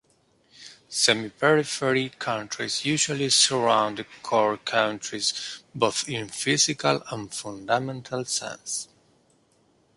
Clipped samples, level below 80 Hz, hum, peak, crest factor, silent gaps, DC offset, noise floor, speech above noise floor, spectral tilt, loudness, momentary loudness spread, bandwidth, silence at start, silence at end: under 0.1%; -66 dBFS; none; -4 dBFS; 22 dB; none; under 0.1%; -64 dBFS; 39 dB; -2.5 dB/octave; -24 LUFS; 12 LU; 11.5 kHz; 0.6 s; 1.1 s